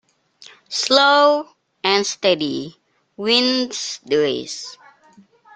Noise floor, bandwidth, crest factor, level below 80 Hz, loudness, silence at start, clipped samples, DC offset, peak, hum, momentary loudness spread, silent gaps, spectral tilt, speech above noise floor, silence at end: -52 dBFS; 9.4 kHz; 20 dB; -66 dBFS; -18 LUFS; 0.4 s; under 0.1%; under 0.1%; 0 dBFS; none; 17 LU; none; -2.5 dB/octave; 34 dB; 0.8 s